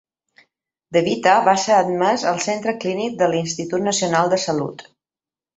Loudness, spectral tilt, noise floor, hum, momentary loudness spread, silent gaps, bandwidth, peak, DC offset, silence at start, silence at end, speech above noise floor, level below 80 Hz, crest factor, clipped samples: -19 LUFS; -4 dB/octave; under -90 dBFS; none; 8 LU; none; 8.4 kHz; -2 dBFS; under 0.1%; 0.9 s; 0.75 s; over 71 dB; -62 dBFS; 18 dB; under 0.1%